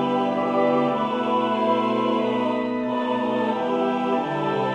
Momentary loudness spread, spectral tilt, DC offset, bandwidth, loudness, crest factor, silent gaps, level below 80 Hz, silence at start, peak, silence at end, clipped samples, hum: 3 LU; -7 dB/octave; under 0.1%; 8.6 kHz; -23 LUFS; 14 dB; none; -66 dBFS; 0 s; -8 dBFS; 0 s; under 0.1%; none